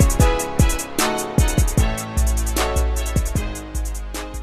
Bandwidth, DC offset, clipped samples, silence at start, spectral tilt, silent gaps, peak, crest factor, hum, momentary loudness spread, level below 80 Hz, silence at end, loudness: 14 kHz; under 0.1%; under 0.1%; 0 s; -4.5 dB/octave; none; -4 dBFS; 16 dB; none; 10 LU; -22 dBFS; 0 s; -21 LUFS